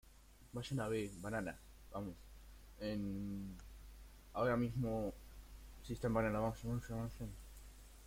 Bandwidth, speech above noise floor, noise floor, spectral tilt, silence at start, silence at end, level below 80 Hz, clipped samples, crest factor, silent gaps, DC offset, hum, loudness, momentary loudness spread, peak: 16.5 kHz; 22 dB; -63 dBFS; -6.5 dB/octave; 0.05 s; 0 s; -56 dBFS; under 0.1%; 18 dB; none; under 0.1%; none; -43 LUFS; 21 LU; -24 dBFS